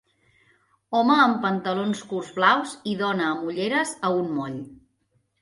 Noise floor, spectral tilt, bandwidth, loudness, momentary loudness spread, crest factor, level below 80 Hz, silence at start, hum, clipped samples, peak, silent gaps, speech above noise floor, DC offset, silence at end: -70 dBFS; -4.5 dB/octave; 11.5 kHz; -23 LUFS; 12 LU; 20 dB; -68 dBFS; 0.9 s; none; under 0.1%; -4 dBFS; none; 46 dB; under 0.1%; 0.65 s